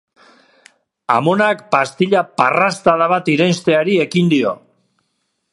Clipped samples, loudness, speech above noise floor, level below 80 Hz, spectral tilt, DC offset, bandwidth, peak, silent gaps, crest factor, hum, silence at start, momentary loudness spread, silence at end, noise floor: under 0.1%; -15 LUFS; 55 dB; -62 dBFS; -5.5 dB/octave; under 0.1%; 11.5 kHz; 0 dBFS; none; 16 dB; none; 1.1 s; 4 LU; 0.95 s; -69 dBFS